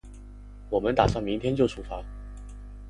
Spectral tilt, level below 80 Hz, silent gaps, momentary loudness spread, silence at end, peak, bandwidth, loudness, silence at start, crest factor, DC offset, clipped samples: -7 dB/octave; -40 dBFS; none; 24 LU; 0 s; -4 dBFS; 11.5 kHz; -27 LUFS; 0.05 s; 24 dB; under 0.1%; under 0.1%